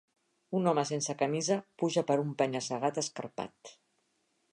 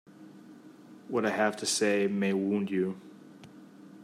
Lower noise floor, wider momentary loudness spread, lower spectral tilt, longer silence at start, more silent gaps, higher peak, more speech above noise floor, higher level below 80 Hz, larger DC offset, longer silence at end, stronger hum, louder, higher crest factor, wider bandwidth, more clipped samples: first, -76 dBFS vs -52 dBFS; second, 10 LU vs 24 LU; about the same, -4.5 dB/octave vs -4 dB/octave; first, 0.5 s vs 0.1 s; neither; about the same, -14 dBFS vs -14 dBFS; first, 44 dB vs 23 dB; about the same, -80 dBFS vs -82 dBFS; neither; first, 0.8 s vs 0 s; neither; second, -32 LUFS vs -29 LUFS; about the same, 20 dB vs 18 dB; second, 11 kHz vs 15 kHz; neither